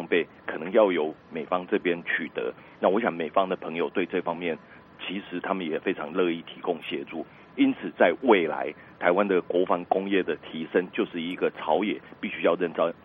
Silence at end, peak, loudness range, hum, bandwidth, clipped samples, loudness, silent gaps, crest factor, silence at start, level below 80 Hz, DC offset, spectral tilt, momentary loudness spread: 0.1 s; -6 dBFS; 5 LU; none; 4.4 kHz; under 0.1%; -27 LUFS; none; 22 dB; 0 s; -70 dBFS; under 0.1%; -8.5 dB/octave; 11 LU